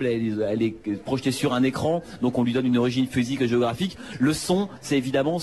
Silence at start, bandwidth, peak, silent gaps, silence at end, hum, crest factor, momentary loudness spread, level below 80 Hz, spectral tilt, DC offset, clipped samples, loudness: 0 s; 12.5 kHz; -10 dBFS; none; 0 s; none; 14 dB; 4 LU; -54 dBFS; -6 dB/octave; 0.2%; under 0.1%; -24 LUFS